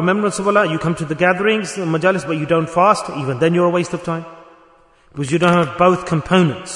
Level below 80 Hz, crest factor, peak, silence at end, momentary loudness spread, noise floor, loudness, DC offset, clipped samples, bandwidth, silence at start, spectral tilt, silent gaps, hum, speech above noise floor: -50 dBFS; 16 dB; 0 dBFS; 0 s; 8 LU; -51 dBFS; -17 LUFS; under 0.1%; under 0.1%; 11 kHz; 0 s; -6 dB/octave; none; none; 34 dB